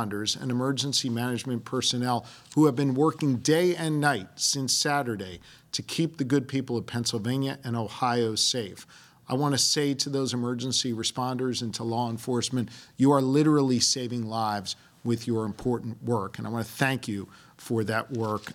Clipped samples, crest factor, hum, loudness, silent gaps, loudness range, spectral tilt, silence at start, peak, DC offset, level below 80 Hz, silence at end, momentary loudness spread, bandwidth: under 0.1%; 20 dB; none; -27 LUFS; none; 5 LU; -4 dB/octave; 0 s; -8 dBFS; under 0.1%; -66 dBFS; 0 s; 10 LU; 16.5 kHz